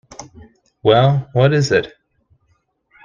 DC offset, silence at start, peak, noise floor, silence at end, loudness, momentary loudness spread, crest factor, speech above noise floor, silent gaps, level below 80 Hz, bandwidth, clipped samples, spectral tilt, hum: under 0.1%; 0.2 s; 0 dBFS; -63 dBFS; 1.15 s; -15 LUFS; 22 LU; 18 dB; 49 dB; none; -50 dBFS; 7.4 kHz; under 0.1%; -6 dB/octave; none